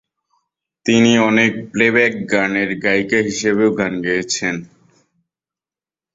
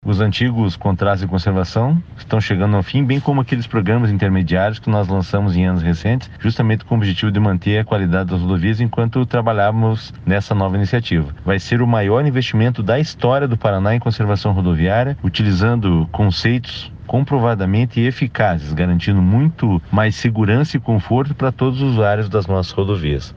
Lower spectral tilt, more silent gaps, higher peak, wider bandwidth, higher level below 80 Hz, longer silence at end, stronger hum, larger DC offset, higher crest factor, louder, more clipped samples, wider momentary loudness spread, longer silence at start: second, -4.5 dB/octave vs -8 dB/octave; neither; about the same, -2 dBFS vs -2 dBFS; about the same, 7.8 kHz vs 7.2 kHz; second, -56 dBFS vs -36 dBFS; first, 1.5 s vs 0.05 s; neither; neither; about the same, 16 dB vs 14 dB; about the same, -16 LUFS vs -17 LUFS; neither; first, 7 LU vs 4 LU; first, 0.85 s vs 0.05 s